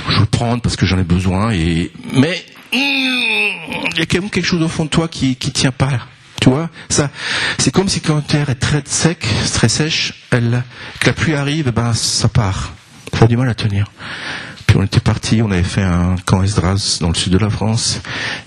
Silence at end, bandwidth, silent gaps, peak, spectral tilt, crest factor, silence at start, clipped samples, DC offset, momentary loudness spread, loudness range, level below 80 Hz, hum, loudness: 0 s; 12.5 kHz; none; 0 dBFS; -4.5 dB/octave; 16 dB; 0 s; under 0.1%; under 0.1%; 7 LU; 1 LU; -34 dBFS; none; -16 LUFS